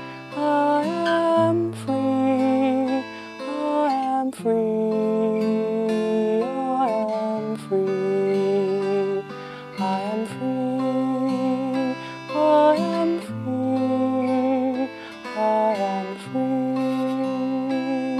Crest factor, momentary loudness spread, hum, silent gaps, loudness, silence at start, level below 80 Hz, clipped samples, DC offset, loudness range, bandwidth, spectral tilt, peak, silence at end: 14 dB; 8 LU; none; none; -23 LUFS; 0 s; -70 dBFS; under 0.1%; under 0.1%; 3 LU; 12 kHz; -7 dB/octave; -8 dBFS; 0 s